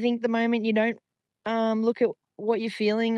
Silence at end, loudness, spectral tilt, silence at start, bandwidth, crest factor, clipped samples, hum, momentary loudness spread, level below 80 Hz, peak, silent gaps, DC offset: 0 s; -26 LUFS; -6.5 dB/octave; 0 s; 9.6 kHz; 14 dB; under 0.1%; none; 7 LU; -82 dBFS; -12 dBFS; none; under 0.1%